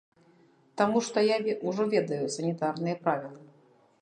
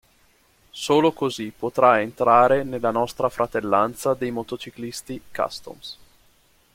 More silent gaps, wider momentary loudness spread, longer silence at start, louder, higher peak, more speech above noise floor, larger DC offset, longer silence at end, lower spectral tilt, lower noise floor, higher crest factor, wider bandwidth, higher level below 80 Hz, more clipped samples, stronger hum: neither; second, 6 LU vs 17 LU; about the same, 0.75 s vs 0.75 s; second, -29 LUFS vs -22 LUFS; second, -10 dBFS vs -4 dBFS; second, 34 dB vs 38 dB; neither; second, 0.55 s vs 0.8 s; about the same, -5 dB/octave vs -5 dB/octave; about the same, -62 dBFS vs -60 dBFS; about the same, 20 dB vs 20 dB; second, 10 kHz vs 16.5 kHz; second, -78 dBFS vs -56 dBFS; neither; neither